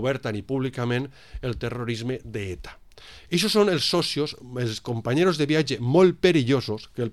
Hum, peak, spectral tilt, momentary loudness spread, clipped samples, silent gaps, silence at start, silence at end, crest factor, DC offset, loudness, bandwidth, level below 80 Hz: none; -6 dBFS; -5.5 dB/octave; 14 LU; under 0.1%; none; 0 s; 0 s; 18 dB; 0.2%; -24 LUFS; 14.5 kHz; -48 dBFS